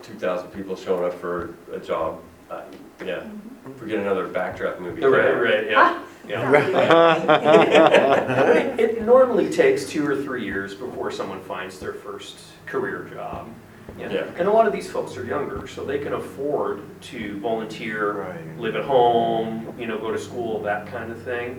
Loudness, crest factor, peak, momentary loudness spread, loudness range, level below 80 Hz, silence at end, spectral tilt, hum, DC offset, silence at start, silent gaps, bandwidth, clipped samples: -21 LUFS; 22 dB; 0 dBFS; 19 LU; 13 LU; -56 dBFS; 0 s; -5.5 dB/octave; none; under 0.1%; 0 s; none; 18.5 kHz; under 0.1%